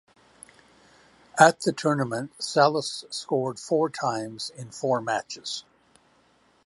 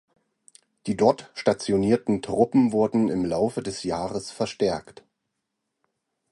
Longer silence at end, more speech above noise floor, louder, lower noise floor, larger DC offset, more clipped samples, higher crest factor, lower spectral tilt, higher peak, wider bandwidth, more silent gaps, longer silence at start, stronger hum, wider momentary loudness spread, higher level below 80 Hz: second, 1.05 s vs 1.5 s; second, 38 dB vs 57 dB; about the same, -25 LUFS vs -24 LUFS; second, -63 dBFS vs -80 dBFS; neither; neither; about the same, 26 dB vs 22 dB; second, -4 dB/octave vs -6 dB/octave; about the same, -2 dBFS vs -4 dBFS; about the same, 11.5 kHz vs 11.5 kHz; neither; first, 1.35 s vs 0.85 s; neither; first, 15 LU vs 10 LU; second, -72 dBFS vs -56 dBFS